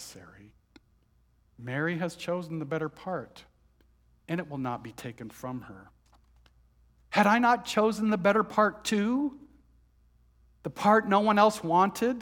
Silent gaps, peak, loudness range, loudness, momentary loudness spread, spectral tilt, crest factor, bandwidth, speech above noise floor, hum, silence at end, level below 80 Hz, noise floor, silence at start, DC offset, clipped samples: none; -8 dBFS; 13 LU; -27 LUFS; 19 LU; -5.5 dB/octave; 22 dB; 18 kHz; 39 dB; none; 0 s; -64 dBFS; -66 dBFS; 0 s; under 0.1%; under 0.1%